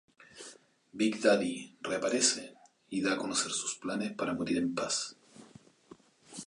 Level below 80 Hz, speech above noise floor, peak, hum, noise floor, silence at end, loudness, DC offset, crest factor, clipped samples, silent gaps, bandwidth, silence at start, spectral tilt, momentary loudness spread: -72 dBFS; 27 dB; -12 dBFS; none; -58 dBFS; 0.05 s; -32 LUFS; under 0.1%; 22 dB; under 0.1%; none; 11.5 kHz; 0.2 s; -2.5 dB/octave; 22 LU